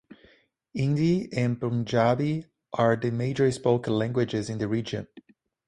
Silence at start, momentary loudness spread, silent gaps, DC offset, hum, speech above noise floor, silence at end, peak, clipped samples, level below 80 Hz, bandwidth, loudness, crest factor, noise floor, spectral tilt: 0.75 s; 11 LU; none; under 0.1%; none; 35 dB; 0.5 s; -8 dBFS; under 0.1%; -58 dBFS; 11 kHz; -26 LUFS; 18 dB; -60 dBFS; -7 dB/octave